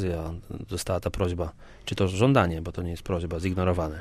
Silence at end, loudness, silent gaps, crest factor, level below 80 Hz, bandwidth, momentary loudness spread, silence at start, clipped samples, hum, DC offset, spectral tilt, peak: 0 s; -28 LUFS; none; 20 dB; -42 dBFS; 14.5 kHz; 14 LU; 0 s; under 0.1%; none; under 0.1%; -6.5 dB/octave; -8 dBFS